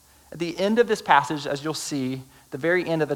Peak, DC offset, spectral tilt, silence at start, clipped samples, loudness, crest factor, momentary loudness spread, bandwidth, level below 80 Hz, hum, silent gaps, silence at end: -4 dBFS; under 0.1%; -4.5 dB/octave; 0.3 s; under 0.1%; -24 LUFS; 20 dB; 12 LU; 19 kHz; -62 dBFS; none; none; 0 s